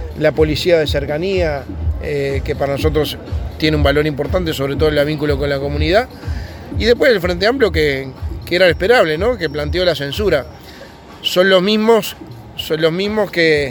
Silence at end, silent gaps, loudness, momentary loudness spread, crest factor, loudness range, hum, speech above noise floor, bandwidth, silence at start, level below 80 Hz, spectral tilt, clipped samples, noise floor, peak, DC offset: 0 s; none; -16 LUFS; 13 LU; 16 dB; 3 LU; none; 21 dB; 19 kHz; 0 s; -28 dBFS; -5.5 dB/octave; under 0.1%; -36 dBFS; 0 dBFS; under 0.1%